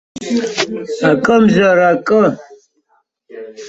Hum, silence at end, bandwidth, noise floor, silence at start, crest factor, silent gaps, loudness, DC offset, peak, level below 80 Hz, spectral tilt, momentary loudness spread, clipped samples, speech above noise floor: none; 0 s; 8 kHz; -61 dBFS; 0.15 s; 14 dB; none; -13 LUFS; under 0.1%; -2 dBFS; -54 dBFS; -5.5 dB/octave; 15 LU; under 0.1%; 48 dB